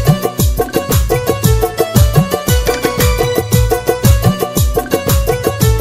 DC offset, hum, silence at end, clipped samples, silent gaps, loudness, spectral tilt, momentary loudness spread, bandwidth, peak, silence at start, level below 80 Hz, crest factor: under 0.1%; none; 0 s; under 0.1%; none; -13 LUFS; -5.5 dB/octave; 4 LU; 16.5 kHz; 0 dBFS; 0 s; -18 dBFS; 12 dB